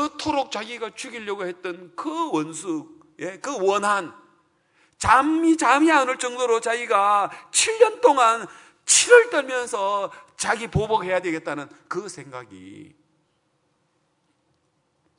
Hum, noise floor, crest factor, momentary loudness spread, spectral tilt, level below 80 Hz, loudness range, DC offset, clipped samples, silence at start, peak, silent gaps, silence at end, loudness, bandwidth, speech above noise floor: none; -69 dBFS; 22 dB; 17 LU; -2.5 dB/octave; -54 dBFS; 12 LU; under 0.1%; under 0.1%; 0 s; 0 dBFS; none; 2.35 s; -21 LUFS; 11 kHz; 47 dB